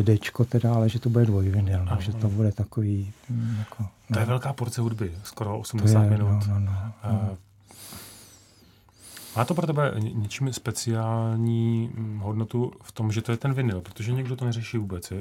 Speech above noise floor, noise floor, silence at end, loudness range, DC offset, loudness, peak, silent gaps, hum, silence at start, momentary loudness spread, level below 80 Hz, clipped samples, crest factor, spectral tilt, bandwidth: 31 dB; -56 dBFS; 0 s; 5 LU; under 0.1%; -26 LUFS; -6 dBFS; none; none; 0 s; 11 LU; -54 dBFS; under 0.1%; 18 dB; -7 dB/octave; 15 kHz